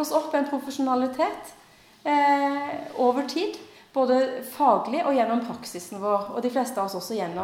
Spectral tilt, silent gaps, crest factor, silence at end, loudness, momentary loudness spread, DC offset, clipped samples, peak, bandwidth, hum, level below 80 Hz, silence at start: -4.5 dB/octave; none; 18 dB; 0 s; -25 LUFS; 11 LU; under 0.1%; under 0.1%; -8 dBFS; 17 kHz; none; -70 dBFS; 0 s